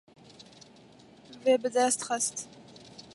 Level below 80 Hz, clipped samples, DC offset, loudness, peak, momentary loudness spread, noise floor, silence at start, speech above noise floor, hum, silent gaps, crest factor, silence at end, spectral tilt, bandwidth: -76 dBFS; under 0.1%; under 0.1%; -28 LUFS; -12 dBFS; 25 LU; -55 dBFS; 0.4 s; 27 dB; none; none; 20 dB; 0.15 s; -2 dB/octave; 11.5 kHz